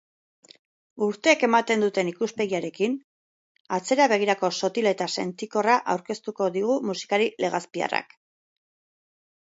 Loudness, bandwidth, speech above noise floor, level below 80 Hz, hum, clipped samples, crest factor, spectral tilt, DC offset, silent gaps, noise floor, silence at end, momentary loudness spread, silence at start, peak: -25 LUFS; 8 kHz; over 66 dB; -76 dBFS; none; under 0.1%; 22 dB; -4 dB/octave; under 0.1%; 3.04-3.65 s; under -90 dBFS; 1.55 s; 8 LU; 0.95 s; -4 dBFS